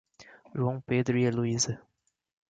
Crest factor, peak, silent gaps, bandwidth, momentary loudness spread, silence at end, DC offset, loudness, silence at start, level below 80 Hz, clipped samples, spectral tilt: 16 dB; -14 dBFS; none; 9.4 kHz; 10 LU; 0.7 s; under 0.1%; -29 LUFS; 0.2 s; -64 dBFS; under 0.1%; -5 dB/octave